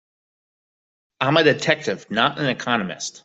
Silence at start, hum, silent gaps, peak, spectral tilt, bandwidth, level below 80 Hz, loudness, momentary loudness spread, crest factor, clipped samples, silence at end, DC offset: 1.2 s; none; none; -2 dBFS; -4 dB/octave; 8.2 kHz; -64 dBFS; -20 LUFS; 8 LU; 20 dB; under 0.1%; 0.05 s; under 0.1%